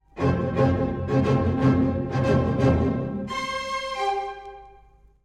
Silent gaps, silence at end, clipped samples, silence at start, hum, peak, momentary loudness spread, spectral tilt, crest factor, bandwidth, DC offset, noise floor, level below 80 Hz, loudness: none; 0.55 s; under 0.1%; 0.15 s; none; -8 dBFS; 8 LU; -7.5 dB/octave; 16 dB; 10 kHz; under 0.1%; -54 dBFS; -44 dBFS; -24 LUFS